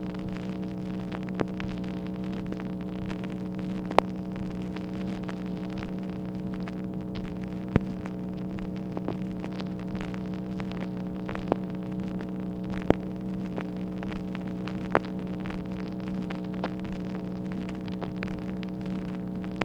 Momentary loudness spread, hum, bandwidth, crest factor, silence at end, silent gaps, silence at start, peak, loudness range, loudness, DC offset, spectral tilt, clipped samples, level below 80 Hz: 6 LU; none; 8.8 kHz; 32 dB; 0 s; none; 0 s; 0 dBFS; 2 LU; -33 LUFS; under 0.1%; -8 dB/octave; under 0.1%; -48 dBFS